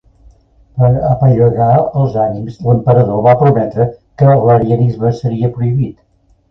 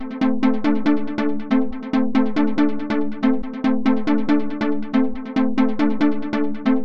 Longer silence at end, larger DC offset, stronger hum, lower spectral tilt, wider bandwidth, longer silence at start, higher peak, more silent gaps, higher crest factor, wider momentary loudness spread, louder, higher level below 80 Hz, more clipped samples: first, 0.6 s vs 0 s; second, under 0.1% vs 6%; neither; first, -11 dB/octave vs -7.5 dB/octave; second, 5.8 kHz vs 6.6 kHz; first, 0.75 s vs 0 s; first, 0 dBFS vs -6 dBFS; neither; about the same, 12 dB vs 12 dB; first, 8 LU vs 4 LU; first, -12 LUFS vs -21 LUFS; first, -40 dBFS vs -46 dBFS; neither